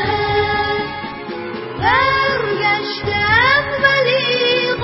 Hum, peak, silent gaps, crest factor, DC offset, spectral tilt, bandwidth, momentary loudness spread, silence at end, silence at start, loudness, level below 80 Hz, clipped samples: none; -2 dBFS; none; 16 dB; under 0.1%; -7.5 dB/octave; 5.8 kHz; 14 LU; 0 s; 0 s; -15 LUFS; -38 dBFS; under 0.1%